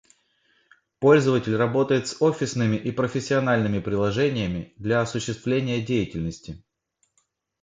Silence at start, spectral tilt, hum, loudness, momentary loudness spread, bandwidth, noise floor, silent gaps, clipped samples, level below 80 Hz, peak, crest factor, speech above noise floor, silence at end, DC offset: 1 s; -6 dB/octave; none; -23 LUFS; 11 LU; 9.4 kHz; -72 dBFS; none; under 0.1%; -50 dBFS; -4 dBFS; 20 dB; 49 dB; 1.05 s; under 0.1%